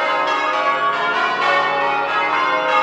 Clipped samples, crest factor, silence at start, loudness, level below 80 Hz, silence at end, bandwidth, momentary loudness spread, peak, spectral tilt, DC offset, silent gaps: under 0.1%; 14 dB; 0 s; -17 LUFS; -62 dBFS; 0 s; 9.4 kHz; 2 LU; -4 dBFS; -3 dB/octave; under 0.1%; none